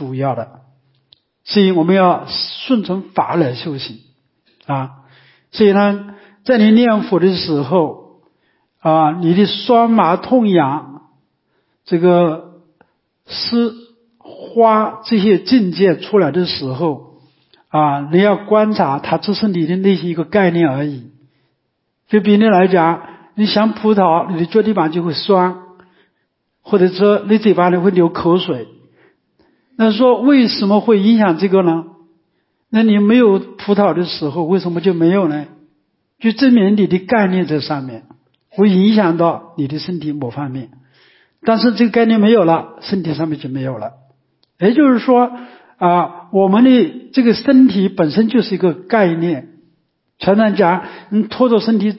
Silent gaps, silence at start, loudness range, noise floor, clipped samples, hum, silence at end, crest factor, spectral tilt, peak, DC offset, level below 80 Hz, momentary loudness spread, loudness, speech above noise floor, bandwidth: none; 0 s; 4 LU; -69 dBFS; under 0.1%; none; 0 s; 14 dB; -11 dB/octave; 0 dBFS; under 0.1%; -58 dBFS; 12 LU; -14 LUFS; 56 dB; 5.8 kHz